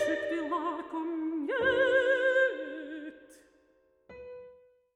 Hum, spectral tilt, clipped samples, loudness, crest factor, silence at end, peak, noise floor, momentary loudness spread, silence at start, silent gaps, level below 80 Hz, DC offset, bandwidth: none; -4 dB/octave; under 0.1%; -29 LUFS; 16 dB; 0.4 s; -14 dBFS; -68 dBFS; 22 LU; 0 s; none; -68 dBFS; under 0.1%; 10 kHz